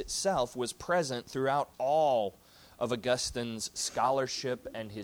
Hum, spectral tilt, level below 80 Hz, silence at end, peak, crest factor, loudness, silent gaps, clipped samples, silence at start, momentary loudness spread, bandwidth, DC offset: none; -3.5 dB/octave; -60 dBFS; 0 s; -16 dBFS; 16 dB; -32 LUFS; none; under 0.1%; 0 s; 8 LU; over 20 kHz; under 0.1%